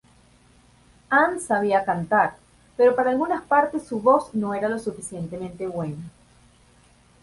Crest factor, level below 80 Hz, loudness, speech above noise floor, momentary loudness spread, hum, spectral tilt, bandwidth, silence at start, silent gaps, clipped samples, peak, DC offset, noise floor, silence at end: 20 dB; -58 dBFS; -23 LUFS; 34 dB; 13 LU; none; -6 dB/octave; 11.5 kHz; 1.1 s; none; under 0.1%; -4 dBFS; under 0.1%; -56 dBFS; 1.15 s